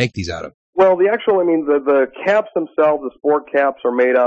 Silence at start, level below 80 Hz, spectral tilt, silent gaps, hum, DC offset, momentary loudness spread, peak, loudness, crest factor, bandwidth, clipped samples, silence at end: 0 s; -54 dBFS; -6.5 dB/octave; 0.54-0.73 s; none; under 0.1%; 8 LU; -4 dBFS; -17 LUFS; 12 dB; 8.2 kHz; under 0.1%; 0 s